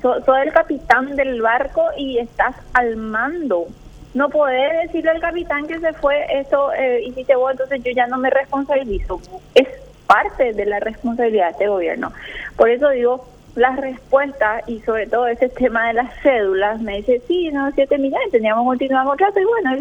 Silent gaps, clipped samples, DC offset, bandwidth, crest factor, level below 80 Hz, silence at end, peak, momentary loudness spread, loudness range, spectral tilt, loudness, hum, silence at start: none; under 0.1%; under 0.1%; 8.6 kHz; 18 dB; -40 dBFS; 0 s; 0 dBFS; 7 LU; 2 LU; -5.5 dB/octave; -18 LUFS; none; 0 s